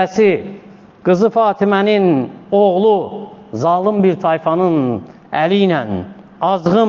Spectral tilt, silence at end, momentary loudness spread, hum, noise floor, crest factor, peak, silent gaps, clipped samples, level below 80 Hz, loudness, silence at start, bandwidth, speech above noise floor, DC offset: -7.5 dB/octave; 0 s; 12 LU; none; -39 dBFS; 14 dB; -2 dBFS; none; under 0.1%; -56 dBFS; -15 LUFS; 0 s; 7.2 kHz; 26 dB; under 0.1%